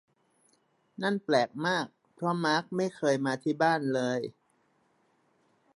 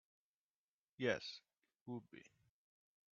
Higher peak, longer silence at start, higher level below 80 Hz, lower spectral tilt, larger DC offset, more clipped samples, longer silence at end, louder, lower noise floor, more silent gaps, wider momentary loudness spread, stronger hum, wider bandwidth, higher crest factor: first, -12 dBFS vs -24 dBFS; about the same, 1 s vs 1 s; first, -80 dBFS vs -86 dBFS; first, -5.5 dB/octave vs -3.5 dB/octave; neither; neither; first, 1.45 s vs 0.9 s; first, -29 LUFS vs -45 LUFS; second, -71 dBFS vs under -90 dBFS; second, none vs 1.81-1.86 s; second, 8 LU vs 21 LU; neither; first, 11.5 kHz vs 7.4 kHz; second, 20 dB vs 26 dB